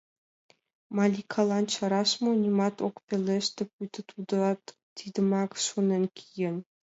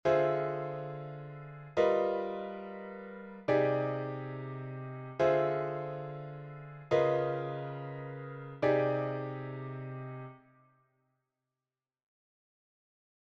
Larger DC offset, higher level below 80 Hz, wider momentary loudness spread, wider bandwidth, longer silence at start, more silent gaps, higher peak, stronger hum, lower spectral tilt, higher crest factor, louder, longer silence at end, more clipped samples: neither; second, -76 dBFS vs -70 dBFS; second, 11 LU vs 16 LU; about the same, 8 kHz vs 7.4 kHz; first, 0.9 s vs 0.05 s; first, 3.03-3.08 s, 3.73-3.79 s, 4.83-4.96 s vs none; first, -12 dBFS vs -16 dBFS; neither; second, -5 dB/octave vs -8 dB/octave; about the same, 16 dB vs 20 dB; first, -28 LUFS vs -34 LUFS; second, 0.2 s vs 2.95 s; neither